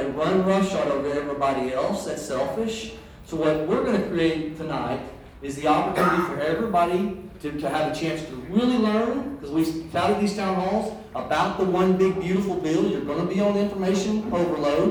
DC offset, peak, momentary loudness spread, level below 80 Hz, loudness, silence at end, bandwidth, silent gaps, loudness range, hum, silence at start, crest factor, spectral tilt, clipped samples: under 0.1%; -8 dBFS; 9 LU; -50 dBFS; -24 LUFS; 0 s; over 20 kHz; none; 3 LU; none; 0 s; 16 dB; -6 dB/octave; under 0.1%